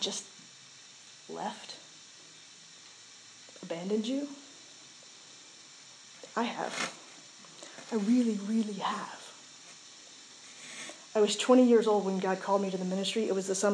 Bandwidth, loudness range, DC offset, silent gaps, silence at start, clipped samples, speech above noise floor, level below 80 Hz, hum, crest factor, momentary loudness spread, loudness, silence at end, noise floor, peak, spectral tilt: 11 kHz; 12 LU; under 0.1%; none; 0 s; under 0.1%; 24 dB; under -90 dBFS; none; 20 dB; 22 LU; -30 LUFS; 0 s; -53 dBFS; -12 dBFS; -4 dB/octave